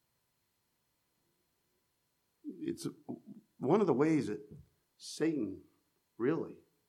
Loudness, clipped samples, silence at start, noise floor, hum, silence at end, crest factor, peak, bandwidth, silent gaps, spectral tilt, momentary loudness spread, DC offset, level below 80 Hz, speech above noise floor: -35 LUFS; under 0.1%; 2.45 s; -80 dBFS; none; 0.35 s; 22 dB; -16 dBFS; 13.5 kHz; none; -6.5 dB/octave; 20 LU; under 0.1%; -80 dBFS; 46 dB